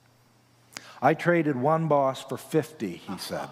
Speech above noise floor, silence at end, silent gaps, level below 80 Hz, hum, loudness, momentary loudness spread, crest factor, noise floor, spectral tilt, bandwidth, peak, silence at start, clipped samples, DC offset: 35 dB; 0 s; none; -76 dBFS; none; -26 LUFS; 15 LU; 20 dB; -61 dBFS; -6.5 dB/octave; 16 kHz; -8 dBFS; 0.75 s; under 0.1%; under 0.1%